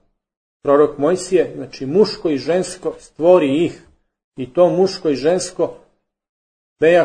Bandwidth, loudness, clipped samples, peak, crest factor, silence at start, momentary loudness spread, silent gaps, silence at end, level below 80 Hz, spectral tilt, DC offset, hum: 9.6 kHz; -17 LUFS; under 0.1%; 0 dBFS; 18 dB; 0.65 s; 11 LU; 4.24-4.32 s, 6.29-6.76 s; 0 s; -54 dBFS; -5.5 dB/octave; under 0.1%; none